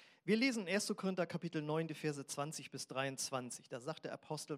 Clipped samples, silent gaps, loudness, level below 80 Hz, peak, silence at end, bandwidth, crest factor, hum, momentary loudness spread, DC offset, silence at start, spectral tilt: under 0.1%; none; -40 LUFS; under -90 dBFS; -22 dBFS; 0 s; 16 kHz; 20 dB; none; 11 LU; under 0.1%; 0 s; -4 dB/octave